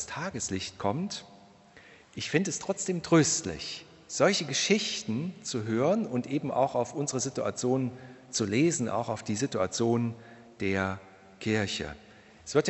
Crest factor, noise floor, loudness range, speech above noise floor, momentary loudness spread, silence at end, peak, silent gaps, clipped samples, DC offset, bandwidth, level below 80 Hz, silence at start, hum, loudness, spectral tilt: 20 dB; -55 dBFS; 3 LU; 26 dB; 12 LU; 0 s; -10 dBFS; none; under 0.1%; under 0.1%; 8.4 kHz; -62 dBFS; 0 s; none; -29 LUFS; -4 dB/octave